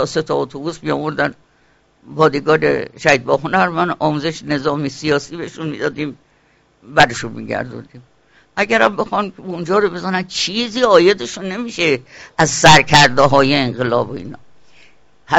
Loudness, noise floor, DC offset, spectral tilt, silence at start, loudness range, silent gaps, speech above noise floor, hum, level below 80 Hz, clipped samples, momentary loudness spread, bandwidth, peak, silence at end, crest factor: -15 LUFS; -55 dBFS; under 0.1%; -4 dB/octave; 0 s; 7 LU; none; 40 dB; none; -44 dBFS; under 0.1%; 15 LU; 8.2 kHz; 0 dBFS; 0 s; 16 dB